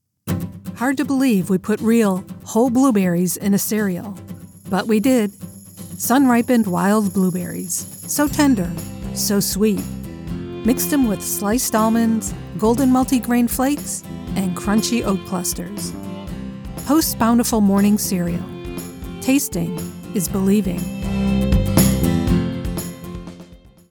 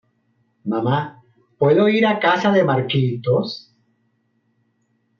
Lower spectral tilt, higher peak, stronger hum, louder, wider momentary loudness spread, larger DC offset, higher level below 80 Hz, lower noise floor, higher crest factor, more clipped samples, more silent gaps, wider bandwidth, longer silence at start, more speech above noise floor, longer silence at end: second, -5 dB/octave vs -7.5 dB/octave; first, 0 dBFS vs -4 dBFS; neither; about the same, -19 LUFS vs -18 LUFS; about the same, 15 LU vs 14 LU; neither; first, -34 dBFS vs -64 dBFS; second, -43 dBFS vs -66 dBFS; about the same, 18 dB vs 16 dB; neither; neither; first, 19 kHz vs 7 kHz; second, 0.25 s vs 0.65 s; second, 25 dB vs 49 dB; second, 0.35 s vs 1.6 s